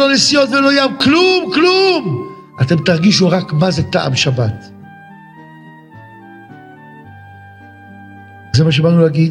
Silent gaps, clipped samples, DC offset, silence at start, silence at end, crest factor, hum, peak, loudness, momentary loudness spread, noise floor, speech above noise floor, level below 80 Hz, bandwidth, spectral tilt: none; under 0.1%; under 0.1%; 0 s; 0 s; 14 dB; none; 0 dBFS; -12 LUFS; 9 LU; -38 dBFS; 26 dB; -50 dBFS; 11 kHz; -5 dB/octave